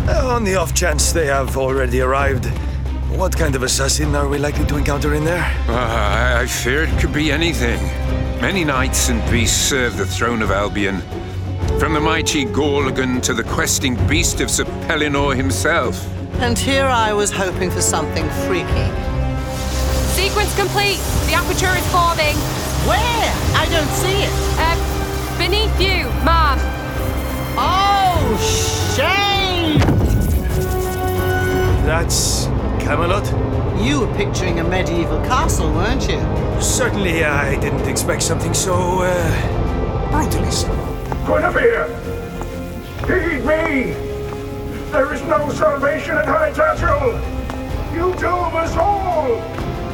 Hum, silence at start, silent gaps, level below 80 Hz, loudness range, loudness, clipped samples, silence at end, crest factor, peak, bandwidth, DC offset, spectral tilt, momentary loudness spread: none; 0 s; none; -24 dBFS; 2 LU; -18 LUFS; under 0.1%; 0 s; 16 dB; -2 dBFS; 20 kHz; under 0.1%; -4.5 dB/octave; 7 LU